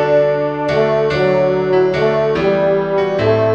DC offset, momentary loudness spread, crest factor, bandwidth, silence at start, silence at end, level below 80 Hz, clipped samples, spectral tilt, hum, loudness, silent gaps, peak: 0.3%; 2 LU; 12 dB; 7.8 kHz; 0 s; 0 s; -44 dBFS; under 0.1%; -7.5 dB/octave; none; -15 LUFS; none; -2 dBFS